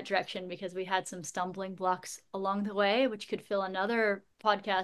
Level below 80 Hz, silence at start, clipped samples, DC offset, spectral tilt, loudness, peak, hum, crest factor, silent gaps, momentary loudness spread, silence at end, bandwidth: -78 dBFS; 0 s; under 0.1%; under 0.1%; -4 dB/octave; -33 LUFS; -12 dBFS; none; 20 dB; none; 10 LU; 0 s; 12.5 kHz